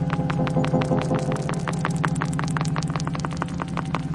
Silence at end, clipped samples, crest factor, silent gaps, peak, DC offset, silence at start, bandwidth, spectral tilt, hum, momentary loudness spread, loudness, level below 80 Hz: 0 s; under 0.1%; 20 dB; none; -4 dBFS; under 0.1%; 0 s; 11.5 kHz; -6.5 dB/octave; none; 5 LU; -25 LUFS; -44 dBFS